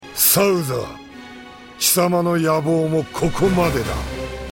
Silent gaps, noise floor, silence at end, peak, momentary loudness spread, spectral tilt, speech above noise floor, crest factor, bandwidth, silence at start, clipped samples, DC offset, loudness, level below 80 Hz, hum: none; -39 dBFS; 0 s; -2 dBFS; 23 LU; -4 dB/octave; 20 dB; 18 dB; 17 kHz; 0 s; under 0.1%; under 0.1%; -18 LUFS; -38 dBFS; none